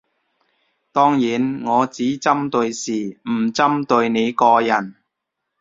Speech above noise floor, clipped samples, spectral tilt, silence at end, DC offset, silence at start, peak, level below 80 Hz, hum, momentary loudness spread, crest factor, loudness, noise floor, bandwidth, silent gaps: 61 dB; under 0.1%; -5 dB/octave; 0.7 s; under 0.1%; 0.95 s; -2 dBFS; -62 dBFS; none; 9 LU; 18 dB; -18 LUFS; -79 dBFS; 7.8 kHz; none